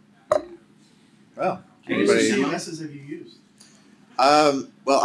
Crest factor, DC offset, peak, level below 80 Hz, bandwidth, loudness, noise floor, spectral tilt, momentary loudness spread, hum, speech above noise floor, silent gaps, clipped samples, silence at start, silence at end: 22 dB; under 0.1%; -2 dBFS; -66 dBFS; 12.5 kHz; -22 LUFS; -55 dBFS; -4 dB/octave; 18 LU; none; 34 dB; none; under 0.1%; 0.3 s; 0 s